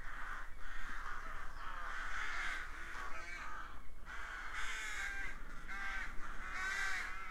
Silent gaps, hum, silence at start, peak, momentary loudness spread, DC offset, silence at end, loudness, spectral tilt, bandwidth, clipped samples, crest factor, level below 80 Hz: none; none; 0 s; -26 dBFS; 9 LU; under 0.1%; 0 s; -44 LUFS; -2 dB/octave; 13.5 kHz; under 0.1%; 12 dB; -48 dBFS